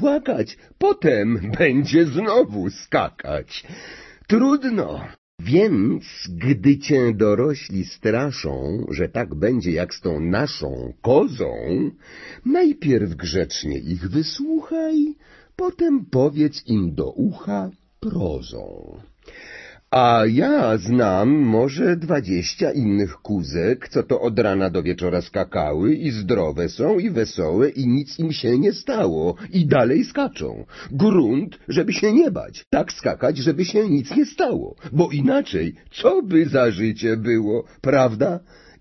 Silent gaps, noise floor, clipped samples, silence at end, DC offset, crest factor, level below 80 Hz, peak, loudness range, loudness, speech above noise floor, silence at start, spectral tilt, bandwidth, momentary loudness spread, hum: 5.18-5.38 s, 32.67-32.71 s; -41 dBFS; under 0.1%; 0.4 s; under 0.1%; 18 dB; -44 dBFS; -2 dBFS; 3 LU; -20 LUFS; 22 dB; 0 s; -7 dB/octave; 6.2 kHz; 11 LU; none